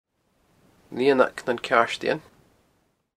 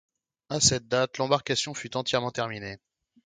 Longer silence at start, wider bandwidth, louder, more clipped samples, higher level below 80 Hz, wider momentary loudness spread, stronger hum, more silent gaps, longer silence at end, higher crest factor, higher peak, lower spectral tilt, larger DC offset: first, 0.9 s vs 0.5 s; first, 13.5 kHz vs 10 kHz; first, -23 LUFS vs -26 LUFS; neither; second, -66 dBFS vs -58 dBFS; second, 10 LU vs 14 LU; neither; neither; first, 0.95 s vs 0.5 s; about the same, 24 dB vs 24 dB; first, -2 dBFS vs -6 dBFS; first, -4.5 dB/octave vs -2.5 dB/octave; neither